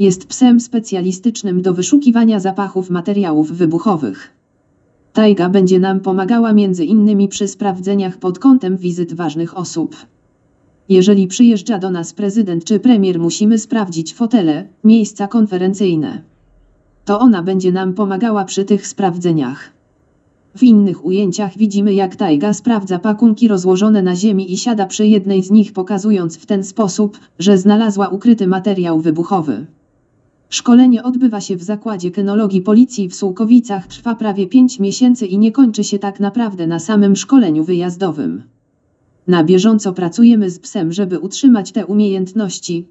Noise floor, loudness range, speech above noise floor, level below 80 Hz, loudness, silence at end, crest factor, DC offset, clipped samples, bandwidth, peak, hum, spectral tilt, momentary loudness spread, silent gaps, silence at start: -59 dBFS; 3 LU; 46 dB; -62 dBFS; -13 LUFS; 0.05 s; 14 dB; under 0.1%; under 0.1%; 8.2 kHz; 0 dBFS; none; -6 dB/octave; 9 LU; none; 0 s